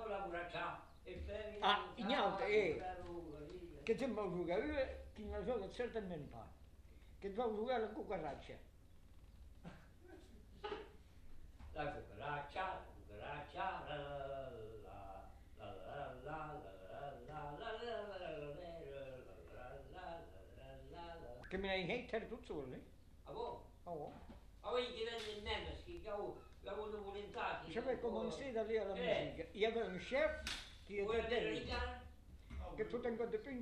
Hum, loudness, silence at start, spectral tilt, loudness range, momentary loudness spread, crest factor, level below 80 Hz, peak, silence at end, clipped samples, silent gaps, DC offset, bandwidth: none; -45 LUFS; 0 s; -5.5 dB/octave; 10 LU; 19 LU; 24 dB; -60 dBFS; -22 dBFS; 0 s; under 0.1%; none; under 0.1%; 13.5 kHz